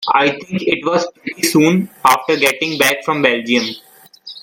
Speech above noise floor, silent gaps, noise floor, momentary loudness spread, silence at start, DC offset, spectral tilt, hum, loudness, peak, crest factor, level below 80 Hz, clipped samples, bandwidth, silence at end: 22 dB; none; -38 dBFS; 8 LU; 0 s; under 0.1%; -4 dB/octave; none; -15 LUFS; 0 dBFS; 16 dB; -60 dBFS; under 0.1%; 17 kHz; 0.05 s